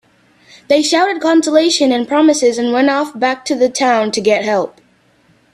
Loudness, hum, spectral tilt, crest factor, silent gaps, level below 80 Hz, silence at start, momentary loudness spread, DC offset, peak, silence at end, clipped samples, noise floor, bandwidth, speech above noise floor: -13 LUFS; none; -3 dB/octave; 14 dB; none; -60 dBFS; 0.7 s; 6 LU; under 0.1%; 0 dBFS; 0.85 s; under 0.1%; -53 dBFS; 13 kHz; 40 dB